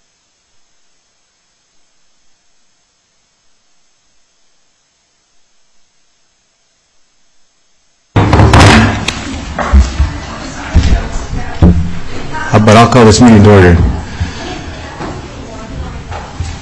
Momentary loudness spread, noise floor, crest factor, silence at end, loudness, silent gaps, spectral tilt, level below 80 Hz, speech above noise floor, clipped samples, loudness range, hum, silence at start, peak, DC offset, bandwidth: 21 LU; -56 dBFS; 12 dB; 0 s; -9 LUFS; none; -6 dB/octave; -20 dBFS; 52 dB; 0.6%; 7 LU; none; 8.15 s; 0 dBFS; under 0.1%; 11 kHz